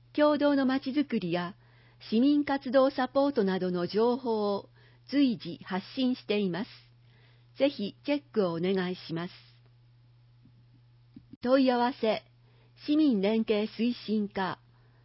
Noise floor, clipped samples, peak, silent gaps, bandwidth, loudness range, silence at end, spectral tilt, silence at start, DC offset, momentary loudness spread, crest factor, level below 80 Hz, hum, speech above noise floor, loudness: -60 dBFS; under 0.1%; -12 dBFS; 11.36-11.41 s; 5.8 kHz; 5 LU; 0.5 s; -10 dB/octave; 0.15 s; under 0.1%; 11 LU; 18 dB; -70 dBFS; none; 32 dB; -29 LUFS